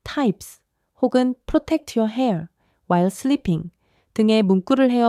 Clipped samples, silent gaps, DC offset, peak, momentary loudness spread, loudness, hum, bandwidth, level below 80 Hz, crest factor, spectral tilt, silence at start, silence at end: under 0.1%; none; under 0.1%; -6 dBFS; 12 LU; -21 LUFS; none; 14.5 kHz; -48 dBFS; 16 dB; -6.5 dB/octave; 0.05 s; 0 s